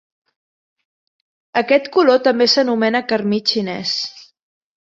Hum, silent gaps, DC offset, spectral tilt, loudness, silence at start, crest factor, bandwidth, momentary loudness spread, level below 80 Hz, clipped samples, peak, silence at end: none; none; under 0.1%; -4 dB/octave; -16 LUFS; 1.55 s; 18 dB; 7.8 kHz; 8 LU; -66 dBFS; under 0.1%; -2 dBFS; 0.65 s